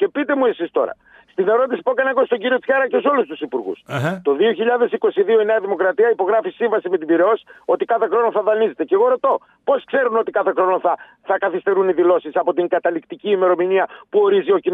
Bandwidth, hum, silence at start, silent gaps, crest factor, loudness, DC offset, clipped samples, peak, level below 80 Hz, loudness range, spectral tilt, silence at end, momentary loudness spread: 7.6 kHz; none; 0 s; none; 14 dB; -18 LUFS; under 0.1%; under 0.1%; -4 dBFS; -72 dBFS; 1 LU; -7 dB/octave; 0 s; 6 LU